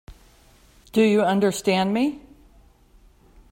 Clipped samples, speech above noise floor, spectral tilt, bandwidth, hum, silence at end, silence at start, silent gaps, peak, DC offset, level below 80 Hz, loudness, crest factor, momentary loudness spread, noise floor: under 0.1%; 34 dB; -5.5 dB/octave; 16.5 kHz; none; 1.35 s; 0.1 s; none; -6 dBFS; under 0.1%; -54 dBFS; -21 LUFS; 18 dB; 8 LU; -54 dBFS